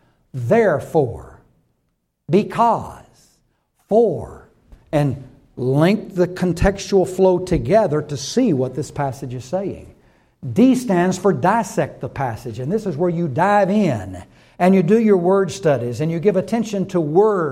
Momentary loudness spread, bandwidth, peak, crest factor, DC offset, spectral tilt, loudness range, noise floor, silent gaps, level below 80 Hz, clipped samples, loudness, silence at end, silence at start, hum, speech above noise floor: 12 LU; 15 kHz; -2 dBFS; 16 dB; under 0.1%; -7 dB/octave; 4 LU; -70 dBFS; none; -40 dBFS; under 0.1%; -18 LUFS; 0 s; 0.35 s; none; 52 dB